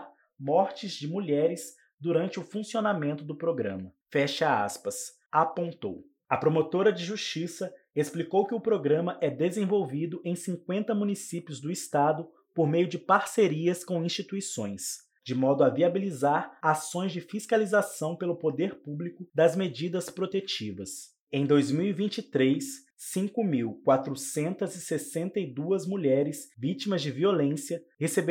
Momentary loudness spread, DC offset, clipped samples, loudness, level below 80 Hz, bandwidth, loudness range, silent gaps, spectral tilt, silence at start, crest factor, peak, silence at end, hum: 10 LU; under 0.1%; under 0.1%; -29 LUFS; -80 dBFS; 18 kHz; 3 LU; 1.94-1.98 s, 5.26-5.30 s, 21.20-21.27 s, 22.93-22.97 s; -5.5 dB/octave; 0 s; 20 dB; -8 dBFS; 0 s; none